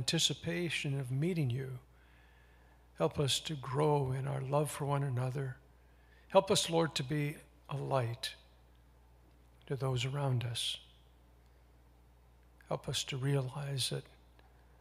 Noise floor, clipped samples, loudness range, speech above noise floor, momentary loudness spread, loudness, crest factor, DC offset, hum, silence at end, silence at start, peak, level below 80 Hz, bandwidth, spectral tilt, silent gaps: -63 dBFS; under 0.1%; 5 LU; 28 dB; 11 LU; -35 LUFS; 24 dB; under 0.1%; none; 0.75 s; 0 s; -12 dBFS; -62 dBFS; 15.5 kHz; -4.5 dB/octave; none